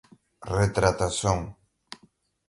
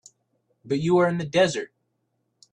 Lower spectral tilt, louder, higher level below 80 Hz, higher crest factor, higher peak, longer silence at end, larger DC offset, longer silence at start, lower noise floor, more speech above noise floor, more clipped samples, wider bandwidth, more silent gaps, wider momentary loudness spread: about the same, -5 dB/octave vs -5.5 dB/octave; about the same, -25 LUFS vs -23 LUFS; first, -42 dBFS vs -64 dBFS; first, 24 dB vs 18 dB; first, -4 dBFS vs -8 dBFS; second, 0.55 s vs 0.9 s; neither; second, 0.4 s vs 0.65 s; second, -63 dBFS vs -74 dBFS; second, 38 dB vs 52 dB; neither; first, 11.5 kHz vs 10 kHz; neither; first, 23 LU vs 12 LU